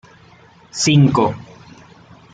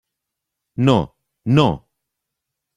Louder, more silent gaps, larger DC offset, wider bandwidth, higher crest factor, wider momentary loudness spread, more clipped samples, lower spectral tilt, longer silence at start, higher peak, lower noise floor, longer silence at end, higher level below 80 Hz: first, -15 LUFS vs -18 LUFS; neither; neither; about the same, 9.2 kHz vs 10 kHz; about the same, 16 dB vs 20 dB; first, 19 LU vs 16 LU; neither; second, -5 dB/octave vs -7.5 dB/octave; about the same, 0.75 s vs 0.8 s; about the same, -2 dBFS vs -2 dBFS; second, -47 dBFS vs -81 dBFS; about the same, 0.95 s vs 1 s; second, -54 dBFS vs -48 dBFS